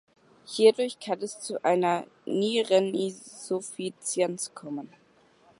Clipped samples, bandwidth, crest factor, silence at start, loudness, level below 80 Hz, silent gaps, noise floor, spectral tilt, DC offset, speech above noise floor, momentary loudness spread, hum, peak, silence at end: under 0.1%; 11.5 kHz; 20 dB; 0.5 s; -27 LUFS; -80 dBFS; none; -61 dBFS; -4 dB/octave; under 0.1%; 33 dB; 15 LU; none; -8 dBFS; 0.75 s